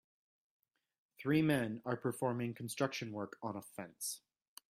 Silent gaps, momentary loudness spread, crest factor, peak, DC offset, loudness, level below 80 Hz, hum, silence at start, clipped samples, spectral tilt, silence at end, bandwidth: none; 12 LU; 20 dB; -20 dBFS; under 0.1%; -38 LUFS; -76 dBFS; none; 1.2 s; under 0.1%; -5.5 dB/octave; 0.5 s; 16 kHz